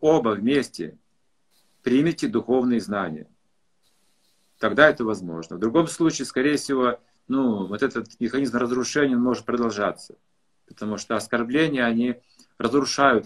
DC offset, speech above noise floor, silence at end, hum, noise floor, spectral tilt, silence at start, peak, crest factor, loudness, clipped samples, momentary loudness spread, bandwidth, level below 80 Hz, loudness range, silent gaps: under 0.1%; 51 dB; 0 s; none; -73 dBFS; -5 dB/octave; 0 s; 0 dBFS; 24 dB; -23 LUFS; under 0.1%; 12 LU; 12.5 kHz; -60 dBFS; 3 LU; none